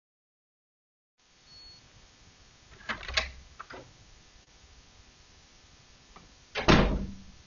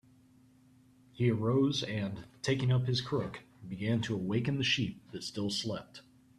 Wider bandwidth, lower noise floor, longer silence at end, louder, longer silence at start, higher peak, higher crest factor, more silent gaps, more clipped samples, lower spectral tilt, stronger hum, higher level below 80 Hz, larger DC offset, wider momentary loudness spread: second, 7.2 kHz vs 12 kHz; second, -57 dBFS vs -63 dBFS; second, 0.15 s vs 0.4 s; first, -28 LUFS vs -33 LUFS; first, 2.9 s vs 1.15 s; first, -6 dBFS vs -16 dBFS; first, 28 dB vs 18 dB; neither; neither; second, -3.5 dB/octave vs -5.5 dB/octave; neither; first, -42 dBFS vs -64 dBFS; neither; first, 27 LU vs 13 LU